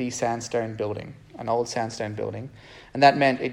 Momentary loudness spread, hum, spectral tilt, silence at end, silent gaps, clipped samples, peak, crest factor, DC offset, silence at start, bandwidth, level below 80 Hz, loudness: 18 LU; none; -4.5 dB/octave; 0 s; none; under 0.1%; -2 dBFS; 24 dB; under 0.1%; 0 s; 12 kHz; -60 dBFS; -24 LUFS